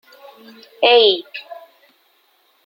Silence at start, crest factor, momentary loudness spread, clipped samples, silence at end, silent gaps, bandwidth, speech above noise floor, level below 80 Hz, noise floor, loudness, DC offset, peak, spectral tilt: 0.8 s; 20 dB; 22 LU; under 0.1%; 1.1 s; none; 16 kHz; 43 dB; -76 dBFS; -59 dBFS; -14 LUFS; under 0.1%; 0 dBFS; -3.5 dB/octave